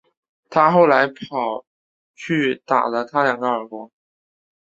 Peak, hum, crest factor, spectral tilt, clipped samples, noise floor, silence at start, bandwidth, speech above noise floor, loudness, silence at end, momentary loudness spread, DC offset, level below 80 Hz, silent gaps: 0 dBFS; none; 20 dB; -6.5 dB/octave; under 0.1%; under -90 dBFS; 0.5 s; 7.8 kHz; over 72 dB; -19 LUFS; 0.8 s; 17 LU; under 0.1%; -66 dBFS; 1.67-2.14 s